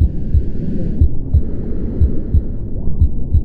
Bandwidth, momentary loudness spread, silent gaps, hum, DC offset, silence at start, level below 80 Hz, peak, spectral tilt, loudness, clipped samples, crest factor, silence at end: 1.9 kHz; 8 LU; none; none; under 0.1%; 0 s; -16 dBFS; 0 dBFS; -12 dB/octave; -19 LUFS; under 0.1%; 14 dB; 0 s